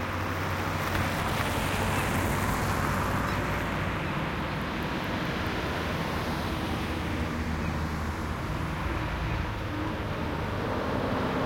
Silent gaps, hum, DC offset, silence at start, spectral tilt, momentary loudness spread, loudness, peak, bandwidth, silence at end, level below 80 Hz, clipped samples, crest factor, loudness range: none; none; under 0.1%; 0 s; -5.5 dB/octave; 4 LU; -30 LUFS; -12 dBFS; 17 kHz; 0 s; -40 dBFS; under 0.1%; 16 dB; 3 LU